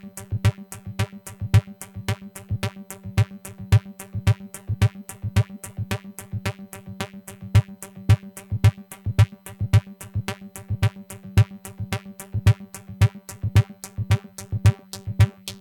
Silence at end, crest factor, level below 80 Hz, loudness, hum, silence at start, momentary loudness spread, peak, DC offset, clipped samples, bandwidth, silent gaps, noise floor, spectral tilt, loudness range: 0.05 s; 22 dB; -38 dBFS; -25 LUFS; none; 0.05 s; 13 LU; -2 dBFS; under 0.1%; under 0.1%; 17.5 kHz; none; -39 dBFS; -6 dB/octave; 4 LU